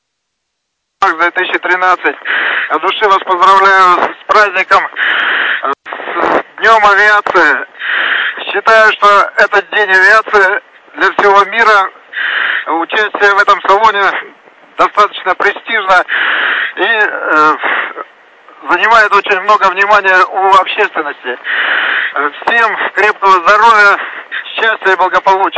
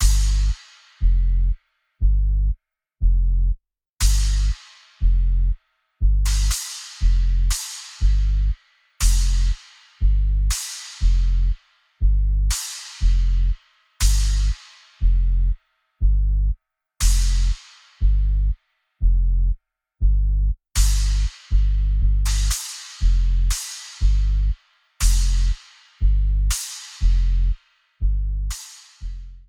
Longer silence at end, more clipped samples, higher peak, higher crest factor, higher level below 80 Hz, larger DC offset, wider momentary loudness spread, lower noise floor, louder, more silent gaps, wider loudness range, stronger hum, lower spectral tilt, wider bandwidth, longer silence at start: about the same, 0 s vs 0.1 s; first, 0.2% vs under 0.1%; first, 0 dBFS vs -4 dBFS; about the same, 10 dB vs 14 dB; second, -52 dBFS vs -20 dBFS; neither; about the same, 9 LU vs 10 LU; first, -70 dBFS vs -41 dBFS; first, -9 LUFS vs -23 LUFS; neither; about the same, 3 LU vs 1 LU; neither; about the same, -2 dB/octave vs -3 dB/octave; second, 8 kHz vs 14 kHz; first, 1 s vs 0 s